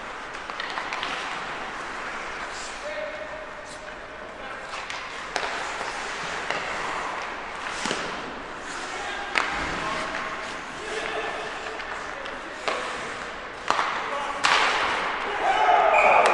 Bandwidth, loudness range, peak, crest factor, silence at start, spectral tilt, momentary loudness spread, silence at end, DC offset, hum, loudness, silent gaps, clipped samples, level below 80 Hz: 11.5 kHz; 8 LU; 0 dBFS; 28 dB; 0 s; -2 dB/octave; 14 LU; 0 s; under 0.1%; none; -27 LUFS; none; under 0.1%; -52 dBFS